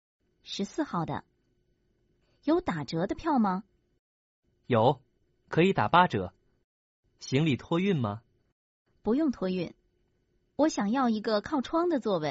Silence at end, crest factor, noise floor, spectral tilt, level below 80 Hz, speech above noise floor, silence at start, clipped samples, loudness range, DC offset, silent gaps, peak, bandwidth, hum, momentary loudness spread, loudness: 0 s; 22 dB; -73 dBFS; -5.5 dB/octave; -60 dBFS; 45 dB; 0.45 s; under 0.1%; 5 LU; under 0.1%; 3.99-4.43 s, 6.64-7.03 s, 8.52-8.85 s; -8 dBFS; 7.6 kHz; none; 12 LU; -29 LUFS